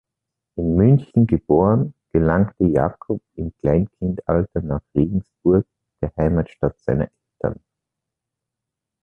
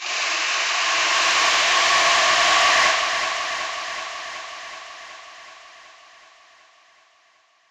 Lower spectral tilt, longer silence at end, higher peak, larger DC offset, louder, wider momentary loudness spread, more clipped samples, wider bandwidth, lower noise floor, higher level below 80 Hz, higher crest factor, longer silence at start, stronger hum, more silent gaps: first, -12 dB/octave vs 1.5 dB/octave; second, 1.5 s vs 1.9 s; about the same, -2 dBFS vs -4 dBFS; neither; about the same, -20 LUFS vs -18 LUFS; second, 12 LU vs 20 LU; neither; second, 3.5 kHz vs 16 kHz; first, -84 dBFS vs -59 dBFS; first, -36 dBFS vs -60 dBFS; about the same, 18 dB vs 18 dB; first, 0.55 s vs 0 s; neither; neither